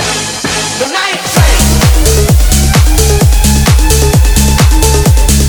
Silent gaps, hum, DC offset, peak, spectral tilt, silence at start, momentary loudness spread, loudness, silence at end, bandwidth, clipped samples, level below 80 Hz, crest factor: none; none; under 0.1%; 0 dBFS; -4 dB/octave; 0 s; 5 LU; -8 LUFS; 0 s; over 20 kHz; 0.5%; -10 dBFS; 6 dB